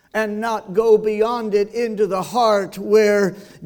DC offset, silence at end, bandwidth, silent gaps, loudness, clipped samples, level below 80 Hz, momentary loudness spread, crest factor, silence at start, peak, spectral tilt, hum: under 0.1%; 0 s; 19 kHz; none; -18 LUFS; under 0.1%; -56 dBFS; 7 LU; 14 dB; 0.15 s; -4 dBFS; -5 dB/octave; none